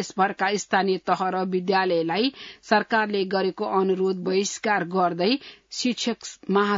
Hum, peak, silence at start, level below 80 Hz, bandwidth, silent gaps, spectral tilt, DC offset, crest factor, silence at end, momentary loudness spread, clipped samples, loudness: none; -6 dBFS; 0 s; -70 dBFS; 7.8 kHz; none; -4.5 dB/octave; under 0.1%; 18 dB; 0 s; 5 LU; under 0.1%; -24 LUFS